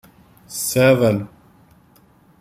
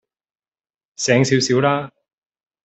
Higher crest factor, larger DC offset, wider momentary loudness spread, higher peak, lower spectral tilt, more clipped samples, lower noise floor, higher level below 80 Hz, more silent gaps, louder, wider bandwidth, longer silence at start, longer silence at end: about the same, 18 dB vs 18 dB; neither; first, 18 LU vs 9 LU; about the same, -2 dBFS vs -2 dBFS; about the same, -5 dB/octave vs -4.5 dB/octave; neither; second, -53 dBFS vs under -90 dBFS; first, -54 dBFS vs -62 dBFS; neither; about the same, -17 LUFS vs -17 LUFS; first, 16 kHz vs 8.4 kHz; second, 0.5 s vs 1 s; first, 1.15 s vs 0.75 s